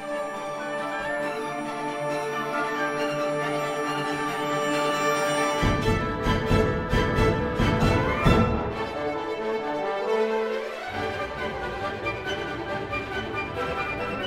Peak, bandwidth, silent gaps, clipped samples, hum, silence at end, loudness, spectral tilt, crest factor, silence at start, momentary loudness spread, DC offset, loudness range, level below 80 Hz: -6 dBFS; 16 kHz; none; under 0.1%; none; 0 s; -26 LUFS; -5.5 dB/octave; 20 dB; 0 s; 8 LU; under 0.1%; 5 LU; -38 dBFS